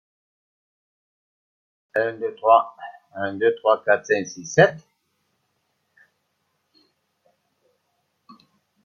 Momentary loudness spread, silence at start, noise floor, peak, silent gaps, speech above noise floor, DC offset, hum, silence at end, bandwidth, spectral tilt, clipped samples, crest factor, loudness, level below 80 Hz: 13 LU; 1.95 s; -73 dBFS; -2 dBFS; none; 52 dB; under 0.1%; none; 4.05 s; 7.2 kHz; -5 dB/octave; under 0.1%; 24 dB; -21 LUFS; -70 dBFS